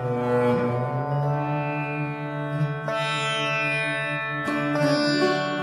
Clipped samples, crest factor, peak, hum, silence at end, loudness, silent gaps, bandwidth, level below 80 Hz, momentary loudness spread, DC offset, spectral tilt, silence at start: under 0.1%; 14 dB; -10 dBFS; none; 0 s; -24 LUFS; none; 12.5 kHz; -62 dBFS; 6 LU; under 0.1%; -6 dB/octave; 0 s